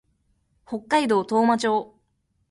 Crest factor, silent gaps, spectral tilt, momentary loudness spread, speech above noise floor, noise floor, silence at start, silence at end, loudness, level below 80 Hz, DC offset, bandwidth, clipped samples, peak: 16 dB; none; -4.5 dB/octave; 12 LU; 49 dB; -70 dBFS; 0.7 s; 0.65 s; -22 LUFS; -66 dBFS; under 0.1%; 11.5 kHz; under 0.1%; -8 dBFS